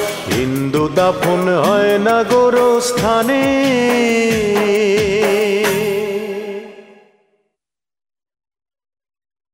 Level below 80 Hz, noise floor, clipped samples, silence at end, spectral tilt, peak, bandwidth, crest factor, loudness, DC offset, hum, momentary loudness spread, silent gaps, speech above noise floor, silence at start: -46 dBFS; -81 dBFS; under 0.1%; 2.7 s; -4.5 dB/octave; -2 dBFS; 16.5 kHz; 14 dB; -14 LUFS; under 0.1%; none; 7 LU; none; 67 dB; 0 s